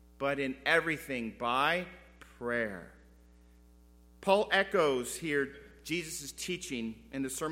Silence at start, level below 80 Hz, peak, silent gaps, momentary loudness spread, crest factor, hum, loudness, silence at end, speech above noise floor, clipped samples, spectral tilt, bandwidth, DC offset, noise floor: 0.2 s; -60 dBFS; -12 dBFS; none; 12 LU; 22 dB; none; -32 LUFS; 0 s; 27 dB; under 0.1%; -3.5 dB/octave; 16.5 kHz; under 0.1%; -59 dBFS